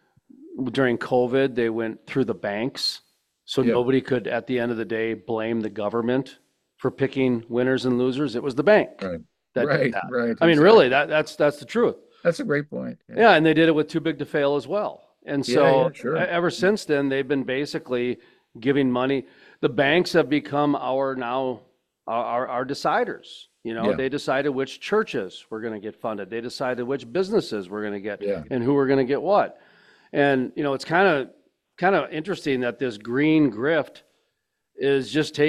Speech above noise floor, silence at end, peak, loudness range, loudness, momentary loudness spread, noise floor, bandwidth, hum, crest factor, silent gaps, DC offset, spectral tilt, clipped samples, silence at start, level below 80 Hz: 54 dB; 0 s; -2 dBFS; 7 LU; -23 LUFS; 12 LU; -77 dBFS; 13 kHz; none; 20 dB; none; under 0.1%; -6 dB/octave; under 0.1%; 0.4 s; -62 dBFS